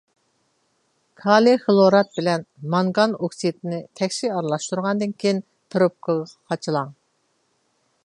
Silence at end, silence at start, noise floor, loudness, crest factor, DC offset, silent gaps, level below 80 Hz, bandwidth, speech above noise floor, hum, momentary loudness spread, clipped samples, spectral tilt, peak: 1.1 s; 1.25 s; -68 dBFS; -21 LUFS; 20 dB; under 0.1%; none; -72 dBFS; 11 kHz; 48 dB; none; 13 LU; under 0.1%; -5.5 dB/octave; -2 dBFS